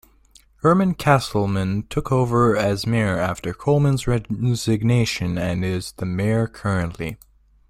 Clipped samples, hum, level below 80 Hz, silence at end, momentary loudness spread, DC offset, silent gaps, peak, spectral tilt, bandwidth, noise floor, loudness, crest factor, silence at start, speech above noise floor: under 0.1%; none; -42 dBFS; 0.55 s; 8 LU; under 0.1%; none; -2 dBFS; -6.5 dB/octave; 15.5 kHz; -54 dBFS; -21 LUFS; 18 dB; 0.65 s; 34 dB